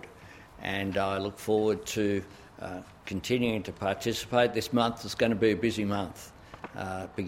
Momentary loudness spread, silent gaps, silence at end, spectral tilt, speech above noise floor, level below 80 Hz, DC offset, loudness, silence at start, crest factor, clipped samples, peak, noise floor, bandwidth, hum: 18 LU; none; 0 s; -5 dB/octave; 21 dB; -58 dBFS; under 0.1%; -30 LUFS; 0 s; 20 dB; under 0.1%; -10 dBFS; -50 dBFS; 16.5 kHz; none